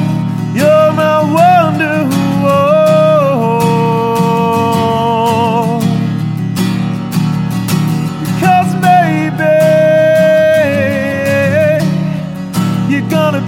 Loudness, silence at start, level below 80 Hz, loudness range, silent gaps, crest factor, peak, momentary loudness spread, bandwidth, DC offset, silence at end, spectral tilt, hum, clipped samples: -11 LUFS; 0 s; -46 dBFS; 4 LU; none; 10 dB; 0 dBFS; 8 LU; 17 kHz; under 0.1%; 0 s; -6.5 dB/octave; none; under 0.1%